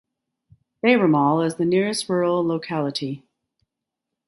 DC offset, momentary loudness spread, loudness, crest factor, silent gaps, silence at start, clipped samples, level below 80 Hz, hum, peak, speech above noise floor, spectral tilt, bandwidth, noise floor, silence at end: under 0.1%; 10 LU; -21 LUFS; 20 dB; none; 0.85 s; under 0.1%; -68 dBFS; none; -2 dBFS; 63 dB; -5.5 dB/octave; 11.5 kHz; -84 dBFS; 1.1 s